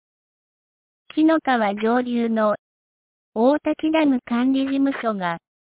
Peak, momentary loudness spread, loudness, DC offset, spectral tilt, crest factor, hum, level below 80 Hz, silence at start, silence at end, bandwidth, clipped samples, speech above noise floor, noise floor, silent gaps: -8 dBFS; 9 LU; -21 LUFS; under 0.1%; -9.5 dB/octave; 14 dB; none; -64 dBFS; 1.15 s; 0.4 s; 4 kHz; under 0.1%; over 70 dB; under -90 dBFS; 2.59-3.32 s